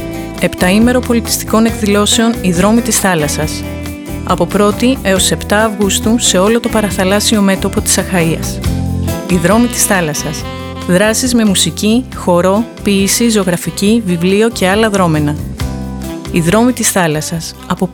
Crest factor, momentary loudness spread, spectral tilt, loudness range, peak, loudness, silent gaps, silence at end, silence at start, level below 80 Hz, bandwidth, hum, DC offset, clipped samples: 12 dB; 10 LU; -4 dB/octave; 2 LU; 0 dBFS; -12 LUFS; none; 0 s; 0 s; -30 dBFS; over 20 kHz; none; under 0.1%; under 0.1%